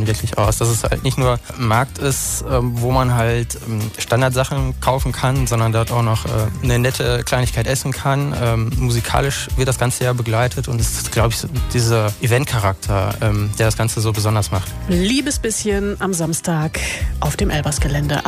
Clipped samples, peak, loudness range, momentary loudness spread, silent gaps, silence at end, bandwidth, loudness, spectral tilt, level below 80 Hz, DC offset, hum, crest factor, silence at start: under 0.1%; -4 dBFS; 1 LU; 4 LU; none; 0 s; 15.5 kHz; -18 LUFS; -5 dB/octave; -28 dBFS; under 0.1%; none; 14 dB; 0 s